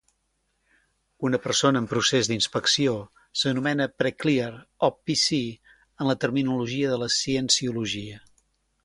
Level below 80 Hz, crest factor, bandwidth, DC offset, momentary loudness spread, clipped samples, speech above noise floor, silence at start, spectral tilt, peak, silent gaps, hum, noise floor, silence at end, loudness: -60 dBFS; 20 dB; 11.5 kHz; under 0.1%; 9 LU; under 0.1%; 48 dB; 1.2 s; -3.5 dB/octave; -6 dBFS; none; none; -73 dBFS; 0.65 s; -24 LUFS